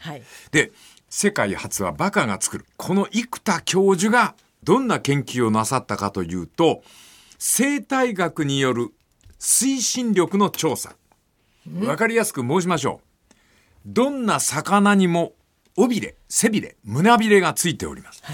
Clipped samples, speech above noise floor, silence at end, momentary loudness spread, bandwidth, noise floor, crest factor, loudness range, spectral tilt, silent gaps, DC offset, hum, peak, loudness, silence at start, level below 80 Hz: under 0.1%; 43 dB; 0 s; 12 LU; 17.5 kHz; -63 dBFS; 18 dB; 3 LU; -4 dB/octave; none; under 0.1%; none; -2 dBFS; -21 LUFS; 0 s; -58 dBFS